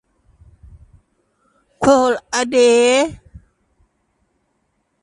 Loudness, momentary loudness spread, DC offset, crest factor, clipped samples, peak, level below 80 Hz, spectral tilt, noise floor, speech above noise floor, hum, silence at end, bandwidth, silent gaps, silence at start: -15 LUFS; 8 LU; under 0.1%; 18 dB; under 0.1%; 0 dBFS; -50 dBFS; -3 dB/octave; -68 dBFS; 54 dB; none; 1.85 s; 11.5 kHz; none; 1.8 s